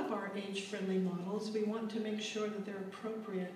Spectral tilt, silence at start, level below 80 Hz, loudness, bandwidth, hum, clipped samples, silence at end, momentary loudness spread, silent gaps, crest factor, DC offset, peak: -5.5 dB/octave; 0 s; -88 dBFS; -39 LUFS; 13.5 kHz; none; under 0.1%; 0 s; 7 LU; none; 14 dB; under 0.1%; -26 dBFS